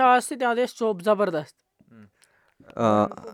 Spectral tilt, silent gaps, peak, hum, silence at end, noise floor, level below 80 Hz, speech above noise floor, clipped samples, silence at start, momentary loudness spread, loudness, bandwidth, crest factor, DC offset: -5 dB/octave; none; -6 dBFS; none; 0 s; -63 dBFS; -70 dBFS; 39 dB; under 0.1%; 0 s; 11 LU; -23 LUFS; 16 kHz; 18 dB; under 0.1%